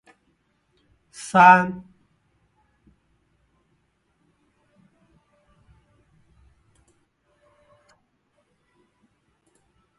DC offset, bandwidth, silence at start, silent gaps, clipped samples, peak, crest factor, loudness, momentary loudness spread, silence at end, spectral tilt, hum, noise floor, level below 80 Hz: under 0.1%; 11.5 kHz; 1.25 s; none; under 0.1%; 0 dBFS; 26 dB; -16 LUFS; 28 LU; 8.2 s; -5.5 dB/octave; none; -69 dBFS; -64 dBFS